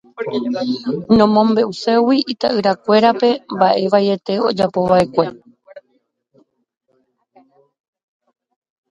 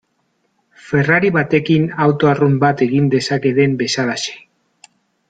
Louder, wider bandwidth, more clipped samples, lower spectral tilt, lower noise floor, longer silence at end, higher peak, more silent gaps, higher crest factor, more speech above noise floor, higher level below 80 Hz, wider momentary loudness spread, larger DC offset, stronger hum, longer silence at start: about the same, -16 LUFS vs -15 LUFS; about the same, 9.6 kHz vs 9.2 kHz; neither; about the same, -6.5 dB/octave vs -6 dB/octave; about the same, -65 dBFS vs -65 dBFS; first, 3.1 s vs 0.9 s; about the same, 0 dBFS vs -2 dBFS; neither; about the same, 18 dB vs 14 dB; about the same, 50 dB vs 51 dB; about the same, -54 dBFS vs -54 dBFS; first, 8 LU vs 5 LU; neither; neither; second, 0.2 s vs 0.85 s